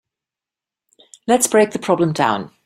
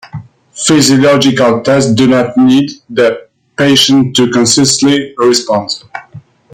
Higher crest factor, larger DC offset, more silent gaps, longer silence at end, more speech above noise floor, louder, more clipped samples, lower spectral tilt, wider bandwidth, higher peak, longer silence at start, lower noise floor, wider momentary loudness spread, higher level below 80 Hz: first, 18 dB vs 10 dB; neither; neither; second, 0.2 s vs 0.35 s; first, 72 dB vs 19 dB; second, -17 LUFS vs -9 LUFS; neither; about the same, -4 dB/octave vs -4 dB/octave; about the same, 16 kHz vs 16 kHz; about the same, -2 dBFS vs 0 dBFS; first, 1.3 s vs 0.15 s; first, -88 dBFS vs -28 dBFS; second, 5 LU vs 14 LU; second, -60 dBFS vs -48 dBFS